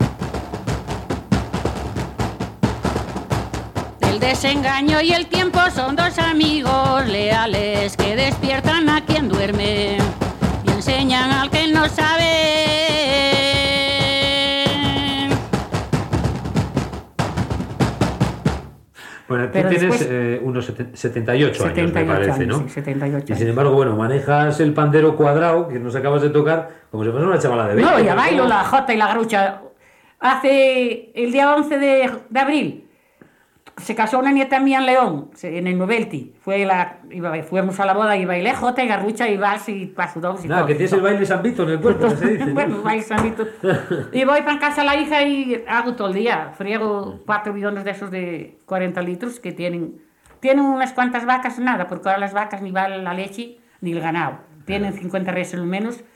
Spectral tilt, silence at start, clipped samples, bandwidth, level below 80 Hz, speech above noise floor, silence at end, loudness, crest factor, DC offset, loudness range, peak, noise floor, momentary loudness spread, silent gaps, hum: -5.5 dB/octave; 0 s; under 0.1%; 16.5 kHz; -38 dBFS; 34 dB; 0.15 s; -19 LUFS; 14 dB; under 0.1%; 7 LU; -4 dBFS; -52 dBFS; 11 LU; none; none